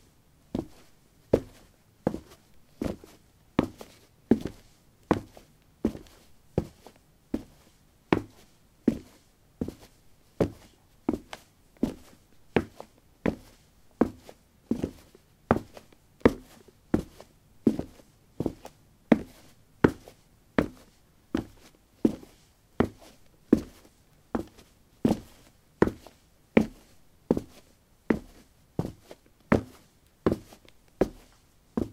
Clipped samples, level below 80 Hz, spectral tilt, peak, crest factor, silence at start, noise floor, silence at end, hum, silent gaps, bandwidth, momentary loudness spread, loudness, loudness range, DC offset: under 0.1%; -52 dBFS; -7.5 dB/octave; -2 dBFS; 32 dB; 0.55 s; -60 dBFS; 0.05 s; none; none; 16 kHz; 22 LU; -31 LUFS; 4 LU; under 0.1%